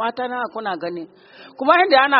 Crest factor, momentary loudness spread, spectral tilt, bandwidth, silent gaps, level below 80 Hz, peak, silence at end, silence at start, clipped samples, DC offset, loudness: 18 dB; 18 LU; 0 dB/octave; 5.6 kHz; none; -68 dBFS; 0 dBFS; 0 s; 0 s; under 0.1%; under 0.1%; -19 LUFS